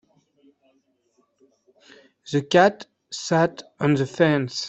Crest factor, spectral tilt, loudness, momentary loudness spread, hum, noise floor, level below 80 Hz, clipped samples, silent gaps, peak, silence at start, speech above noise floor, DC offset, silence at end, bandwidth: 20 dB; -5.5 dB/octave; -21 LUFS; 14 LU; none; -67 dBFS; -62 dBFS; under 0.1%; none; -4 dBFS; 2.25 s; 46 dB; under 0.1%; 0 s; 8.4 kHz